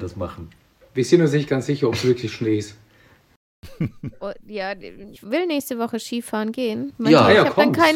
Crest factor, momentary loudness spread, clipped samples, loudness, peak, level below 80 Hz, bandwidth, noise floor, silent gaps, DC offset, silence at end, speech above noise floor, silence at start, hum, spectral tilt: 20 dB; 18 LU; under 0.1%; -20 LUFS; 0 dBFS; -54 dBFS; 16.5 kHz; -54 dBFS; 3.36-3.62 s; under 0.1%; 0 s; 34 dB; 0 s; none; -6 dB/octave